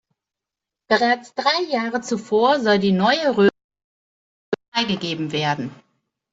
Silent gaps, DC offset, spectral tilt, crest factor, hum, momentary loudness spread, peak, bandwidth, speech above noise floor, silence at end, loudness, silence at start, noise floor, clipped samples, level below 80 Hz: 3.64-3.69 s, 3.84-4.52 s, 4.68-4.72 s; under 0.1%; -5 dB/octave; 18 dB; none; 8 LU; -4 dBFS; 8 kHz; 67 dB; 0.6 s; -20 LUFS; 0.9 s; -86 dBFS; under 0.1%; -62 dBFS